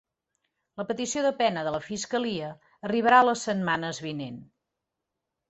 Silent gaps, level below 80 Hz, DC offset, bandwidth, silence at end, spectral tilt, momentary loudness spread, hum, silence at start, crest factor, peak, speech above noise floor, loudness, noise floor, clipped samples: none; -68 dBFS; under 0.1%; 8.2 kHz; 1.05 s; -4 dB/octave; 19 LU; none; 0.75 s; 22 dB; -6 dBFS; 58 dB; -26 LUFS; -85 dBFS; under 0.1%